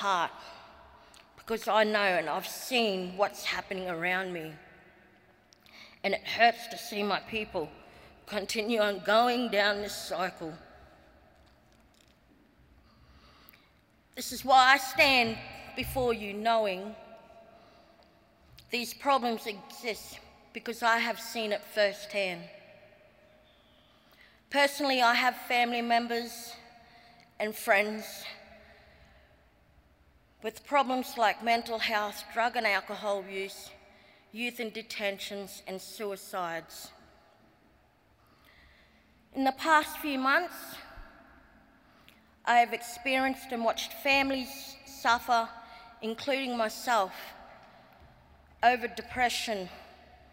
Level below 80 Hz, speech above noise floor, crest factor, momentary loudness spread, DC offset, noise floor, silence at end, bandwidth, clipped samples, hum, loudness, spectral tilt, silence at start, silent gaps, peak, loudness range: -62 dBFS; 35 dB; 26 dB; 18 LU; under 0.1%; -65 dBFS; 0.4 s; 16 kHz; under 0.1%; none; -29 LUFS; -3 dB/octave; 0 s; none; -6 dBFS; 10 LU